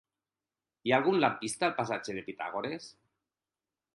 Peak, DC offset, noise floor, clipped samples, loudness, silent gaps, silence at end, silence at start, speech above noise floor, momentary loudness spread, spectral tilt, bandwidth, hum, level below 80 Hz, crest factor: -10 dBFS; under 0.1%; under -90 dBFS; under 0.1%; -31 LUFS; none; 1.05 s; 0.85 s; over 59 dB; 12 LU; -4.5 dB/octave; 11.5 kHz; none; -74 dBFS; 24 dB